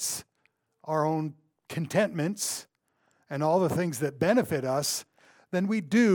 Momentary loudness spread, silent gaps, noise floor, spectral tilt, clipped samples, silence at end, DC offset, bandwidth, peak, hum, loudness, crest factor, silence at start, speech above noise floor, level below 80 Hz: 12 LU; none; -73 dBFS; -5 dB/octave; under 0.1%; 0 s; under 0.1%; 19 kHz; -10 dBFS; none; -29 LUFS; 18 dB; 0 s; 46 dB; -70 dBFS